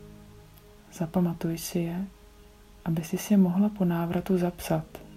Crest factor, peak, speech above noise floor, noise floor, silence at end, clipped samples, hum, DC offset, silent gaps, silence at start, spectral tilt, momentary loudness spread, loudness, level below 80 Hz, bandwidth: 16 dB; -12 dBFS; 26 dB; -52 dBFS; 0 s; under 0.1%; none; under 0.1%; none; 0 s; -7 dB/octave; 13 LU; -28 LUFS; -52 dBFS; 16 kHz